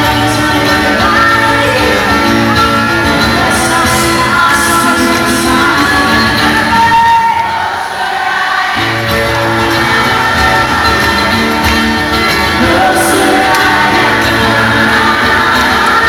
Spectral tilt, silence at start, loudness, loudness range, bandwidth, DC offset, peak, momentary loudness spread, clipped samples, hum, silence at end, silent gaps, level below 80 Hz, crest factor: -3.5 dB/octave; 0 s; -8 LUFS; 2 LU; over 20 kHz; under 0.1%; -2 dBFS; 3 LU; under 0.1%; none; 0 s; none; -28 dBFS; 8 dB